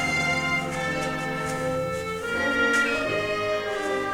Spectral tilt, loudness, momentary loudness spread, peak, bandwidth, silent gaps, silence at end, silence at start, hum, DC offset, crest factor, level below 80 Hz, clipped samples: -4 dB/octave; -25 LUFS; 7 LU; -10 dBFS; 17.5 kHz; none; 0 s; 0 s; none; under 0.1%; 14 dB; -50 dBFS; under 0.1%